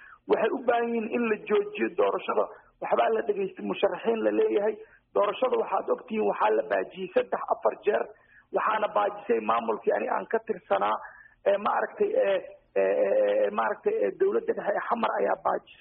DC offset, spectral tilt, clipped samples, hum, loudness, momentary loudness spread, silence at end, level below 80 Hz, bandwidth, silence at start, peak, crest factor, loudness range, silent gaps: under 0.1%; 0 dB/octave; under 0.1%; none; -27 LUFS; 6 LU; 0.1 s; -72 dBFS; 3.8 kHz; 0 s; -12 dBFS; 16 dB; 2 LU; none